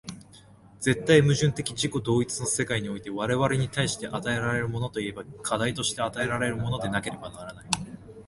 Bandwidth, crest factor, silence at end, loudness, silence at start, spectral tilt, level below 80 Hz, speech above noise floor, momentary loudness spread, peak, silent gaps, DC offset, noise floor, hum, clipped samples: 11.5 kHz; 24 dB; 0.05 s; -27 LUFS; 0.05 s; -4.5 dB/octave; -52 dBFS; 26 dB; 12 LU; -2 dBFS; none; under 0.1%; -52 dBFS; none; under 0.1%